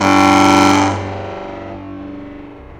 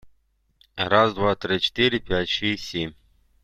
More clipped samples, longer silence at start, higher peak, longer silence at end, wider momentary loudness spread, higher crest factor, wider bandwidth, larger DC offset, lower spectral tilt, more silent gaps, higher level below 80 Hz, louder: neither; about the same, 0 s vs 0.05 s; first, 0 dBFS vs -4 dBFS; second, 0 s vs 0.55 s; first, 22 LU vs 11 LU; second, 14 dB vs 20 dB; about the same, 15 kHz vs 14 kHz; neither; about the same, -4.5 dB/octave vs -5 dB/octave; neither; about the same, -44 dBFS vs -48 dBFS; first, -11 LUFS vs -22 LUFS